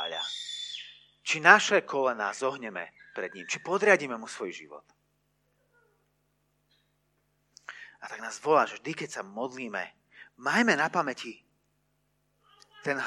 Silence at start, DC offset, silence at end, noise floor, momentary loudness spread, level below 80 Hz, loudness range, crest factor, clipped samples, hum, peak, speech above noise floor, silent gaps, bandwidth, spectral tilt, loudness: 0 s; under 0.1%; 0 s; -74 dBFS; 19 LU; -82 dBFS; 8 LU; 28 dB; under 0.1%; 50 Hz at -65 dBFS; -2 dBFS; 46 dB; none; 13 kHz; -3 dB/octave; -28 LUFS